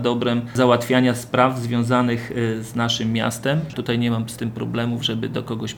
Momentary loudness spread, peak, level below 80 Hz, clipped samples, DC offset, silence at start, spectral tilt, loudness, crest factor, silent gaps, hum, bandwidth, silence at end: 7 LU; 0 dBFS; -54 dBFS; under 0.1%; under 0.1%; 0 s; -5.5 dB/octave; -21 LUFS; 20 dB; none; none; 19 kHz; 0 s